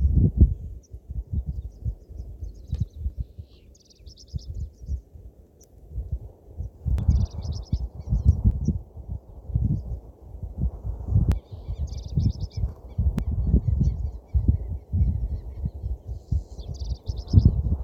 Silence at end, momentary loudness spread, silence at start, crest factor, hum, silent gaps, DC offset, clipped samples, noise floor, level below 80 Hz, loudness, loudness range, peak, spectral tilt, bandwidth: 0 s; 17 LU; 0 s; 24 dB; none; none; under 0.1%; under 0.1%; -52 dBFS; -28 dBFS; -27 LUFS; 10 LU; -2 dBFS; -9 dB/octave; 6.8 kHz